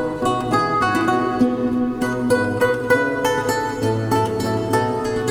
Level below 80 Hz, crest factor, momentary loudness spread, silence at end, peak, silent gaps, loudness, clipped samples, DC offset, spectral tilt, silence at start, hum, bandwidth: -46 dBFS; 16 dB; 4 LU; 0 s; -4 dBFS; none; -19 LUFS; under 0.1%; under 0.1%; -5.5 dB/octave; 0 s; none; 19 kHz